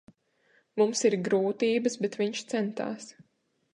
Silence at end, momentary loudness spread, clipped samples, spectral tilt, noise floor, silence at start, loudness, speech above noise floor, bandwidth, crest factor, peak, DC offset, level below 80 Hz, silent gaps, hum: 0.6 s; 12 LU; under 0.1%; -4.5 dB/octave; -68 dBFS; 0.75 s; -28 LUFS; 40 dB; 11 kHz; 18 dB; -12 dBFS; under 0.1%; -80 dBFS; none; none